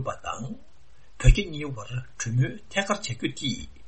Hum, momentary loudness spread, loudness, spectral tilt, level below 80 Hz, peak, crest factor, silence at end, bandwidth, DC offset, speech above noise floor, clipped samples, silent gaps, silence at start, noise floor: none; 13 LU; -28 LUFS; -5 dB/octave; -30 dBFS; -2 dBFS; 24 dB; 0.1 s; 8.6 kHz; 0.8%; 28 dB; under 0.1%; none; 0 s; -58 dBFS